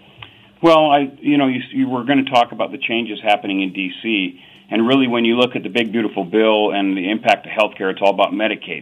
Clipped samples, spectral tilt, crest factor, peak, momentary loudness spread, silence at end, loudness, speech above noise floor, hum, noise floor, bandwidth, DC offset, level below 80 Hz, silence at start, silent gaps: under 0.1%; -6 dB/octave; 16 dB; -2 dBFS; 6 LU; 0 s; -17 LUFS; 25 dB; none; -42 dBFS; 10 kHz; under 0.1%; -64 dBFS; 0.2 s; none